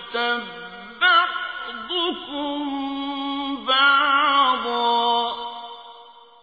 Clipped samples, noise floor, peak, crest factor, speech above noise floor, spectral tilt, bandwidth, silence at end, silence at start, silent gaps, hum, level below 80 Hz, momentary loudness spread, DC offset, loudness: under 0.1%; -46 dBFS; -6 dBFS; 16 dB; 20 dB; -4 dB/octave; 5 kHz; 0.2 s; 0 s; none; none; -64 dBFS; 17 LU; under 0.1%; -21 LUFS